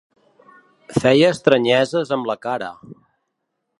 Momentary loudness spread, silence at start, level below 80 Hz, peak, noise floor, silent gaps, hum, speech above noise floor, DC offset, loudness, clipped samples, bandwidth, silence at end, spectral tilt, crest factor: 11 LU; 0.9 s; -58 dBFS; 0 dBFS; -75 dBFS; none; none; 58 dB; under 0.1%; -18 LUFS; under 0.1%; 11.5 kHz; 0.85 s; -5.5 dB/octave; 20 dB